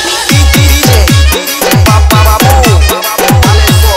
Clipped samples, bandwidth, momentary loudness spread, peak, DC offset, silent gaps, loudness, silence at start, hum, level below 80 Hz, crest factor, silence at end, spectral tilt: 3%; 16.5 kHz; 3 LU; 0 dBFS; under 0.1%; none; -6 LUFS; 0 s; none; -10 dBFS; 6 dB; 0 s; -4 dB/octave